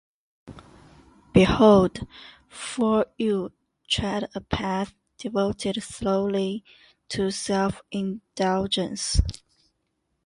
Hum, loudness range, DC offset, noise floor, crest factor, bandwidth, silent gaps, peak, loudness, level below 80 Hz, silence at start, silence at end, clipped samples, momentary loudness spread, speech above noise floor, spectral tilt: none; 5 LU; under 0.1%; -75 dBFS; 22 dB; 11.5 kHz; none; -4 dBFS; -24 LUFS; -40 dBFS; 0.45 s; 0.95 s; under 0.1%; 17 LU; 52 dB; -5.5 dB/octave